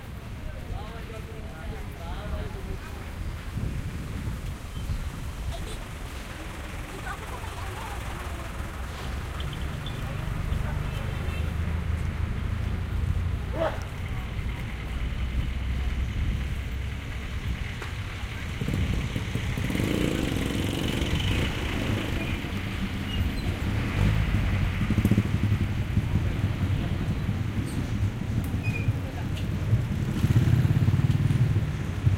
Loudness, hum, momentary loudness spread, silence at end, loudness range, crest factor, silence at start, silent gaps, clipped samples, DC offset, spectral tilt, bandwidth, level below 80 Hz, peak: -30 LUFS; none; 12 LU; 0 s; 9 LU; 20 dB; 0 s; none; under 0.1%; under 0.1%; -6.5 dB/octave; 16 kHz; -34 dBFS; -8 dBFS